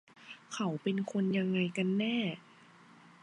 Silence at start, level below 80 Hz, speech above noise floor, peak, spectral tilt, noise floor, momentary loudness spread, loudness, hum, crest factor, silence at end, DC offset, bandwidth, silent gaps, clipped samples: 0.2 s; -82 dBFS; 26 dB; -20 dBFS; -6 dB/octave; -59 dBFS; 16 LU; -33 LUFS; none; 16 dB; 0.85 s; under 0.1%; 10.5 kHz; none; under 0.1%